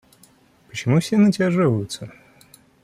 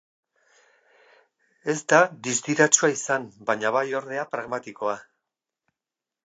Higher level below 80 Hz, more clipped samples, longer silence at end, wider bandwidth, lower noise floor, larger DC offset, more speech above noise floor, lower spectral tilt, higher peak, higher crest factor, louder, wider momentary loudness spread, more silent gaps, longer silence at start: first, -60 dBFS vs -78 dBFS; neither; second, 0.75 s vs 1.25 s; first, 14.5 kHz vs 9.6 kHz; second, -54 dBFS vs -89 dBFS; neither; second, 36 dB vs 65 dB; first, -6.5 dB/octave vs -3 dB/octave; second, -8 dBFS vs -2 dBFS; second, 14 dB vs 24 dB; first, -20 LUFS vs -23 LUFS; first, 17 LU vs 12 LU; neither; second, 0.75 s vs 1.65 s